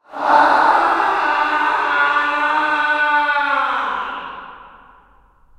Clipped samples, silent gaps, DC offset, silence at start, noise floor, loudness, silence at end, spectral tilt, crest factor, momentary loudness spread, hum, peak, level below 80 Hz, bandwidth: under 0.1%; none; under 0.1%; 0.1 s; -51 dBFS; -16 LUFS; 0.9 s; -2.5 dB/octave; 18 dB; 11 LU; none; 0 dBFS; -54 dBFS; 11 kHz